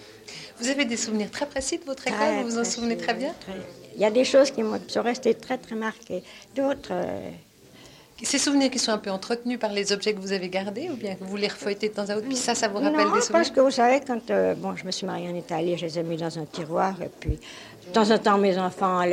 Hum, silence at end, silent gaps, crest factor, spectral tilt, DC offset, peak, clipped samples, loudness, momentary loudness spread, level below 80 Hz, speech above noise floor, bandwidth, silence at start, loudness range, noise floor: none; 0 s; none; 18 dB; -3.5 dB/octave; under 0.1%; -6 dBFS; under 0.1%; -25 LUFS; 12 LU; -52 dBFS; 25 dB; 16 kHz; 0 s; 6 LU; -50 dBFS